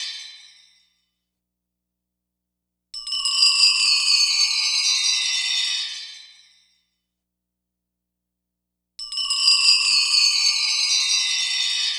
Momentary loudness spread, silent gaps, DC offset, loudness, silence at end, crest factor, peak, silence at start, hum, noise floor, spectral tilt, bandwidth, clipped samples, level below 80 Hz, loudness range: 16 LU; none; under 0.1%; -17 LUFS; 0 s; 20 dB; -4 dBFS; 0 s; 60 Hz at -80 dBFS; -82 dBFS; 7 dB/octave; over 20 kHz; under 0.1%; -68 dBFS; 14 LU